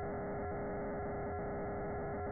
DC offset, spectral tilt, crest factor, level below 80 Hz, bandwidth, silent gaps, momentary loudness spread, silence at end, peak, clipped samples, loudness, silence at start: under 0.1%; -4 dB/octave; 6 dB; -52 dBFS; 2.3 kHz; none; 0 LU; 0 s; -34 dBFS; under 0.1%; -41 LUFS; 0 s